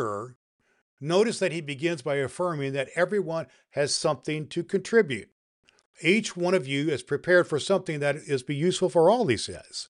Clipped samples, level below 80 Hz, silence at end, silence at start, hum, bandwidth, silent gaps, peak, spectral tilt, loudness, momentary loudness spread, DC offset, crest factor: under 0.1%; -68 dBFS; 0.05 s; 0 s; none; 11.5 kHz; 0.36-0.59 s, 0.82-0.97 s, 5.32-5.63 s, 5.86-5.94 s; -8 dBFS; -4.5 dB/octave; -26 LUFS; 10 LU; under 0.1%; 18 dB